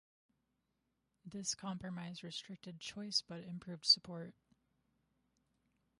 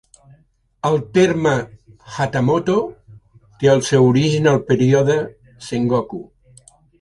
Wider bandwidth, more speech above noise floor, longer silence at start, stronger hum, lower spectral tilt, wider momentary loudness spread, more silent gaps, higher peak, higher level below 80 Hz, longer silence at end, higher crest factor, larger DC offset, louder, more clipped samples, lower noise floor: about the same, 11.5 kHz vs 11.5 kHz; first, 44 dB vs 40 dB; first, 1.25 s vs 0.85 s; neither; second, -2.5 dB/octave vs -6.5 dB/octave; about the same, 19 LU vs 17 LU; neither; second, -16 dBFS vs -2 dBFS; second, -78 dBFS vs -50 dBFS; first, 1.7 s vs 0.75 s; first, 28 dB vs 16 dB; neither; second, -38 LUFS vs -17 LUFS; neither; first, -85 dBFS vs -56 dBFS